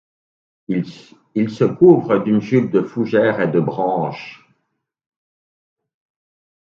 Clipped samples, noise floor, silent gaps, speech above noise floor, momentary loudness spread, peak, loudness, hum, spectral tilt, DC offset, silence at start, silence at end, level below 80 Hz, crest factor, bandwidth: under 0.1%; -73 dBFS; none; 57 dB; 14 LU; 0 dBFS; -17 LUFS; none; -9 dB/octave; under 0.1%; 0.7 s; 2.25 s; -64 dBFS; 18 dB; 7 kHz